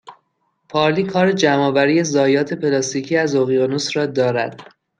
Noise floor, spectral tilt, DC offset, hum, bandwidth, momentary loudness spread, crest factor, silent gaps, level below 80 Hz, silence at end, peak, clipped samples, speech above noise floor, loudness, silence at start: -68 dBFS; -5 dB/octave; under 0.1%; none; 9.6 kHz; 5 LU; 16 dB; none; -64 dBFS; 0.35 s; -2 dBFS; under 0.1%; 51 dB; -17 LUFS; 0.05 s